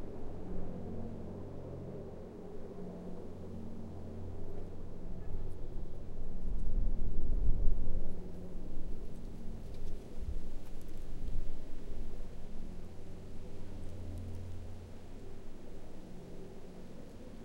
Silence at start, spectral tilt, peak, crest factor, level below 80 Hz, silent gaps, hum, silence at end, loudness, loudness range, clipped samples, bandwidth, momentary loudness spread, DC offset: 0 s; -8 dB/octave; -12 dBFS; 20 dB; -38 dBFS; none; none; 0 s; -46 LUFS; 7 LU; under 0.1%; 2.1 kHz; 11 LU; under 0.1%